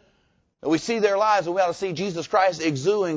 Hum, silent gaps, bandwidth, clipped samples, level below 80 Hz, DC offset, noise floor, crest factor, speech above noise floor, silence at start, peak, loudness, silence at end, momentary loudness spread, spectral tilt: none; none; 8 kHz; under 0.1%; -64 dBFS; under 0.1%; -66 dBFS; 16 dB; 44 dB; 0.65 s; -6 dBFS; -23 LUFS; 0 s; 7 LU; -5 dB/octave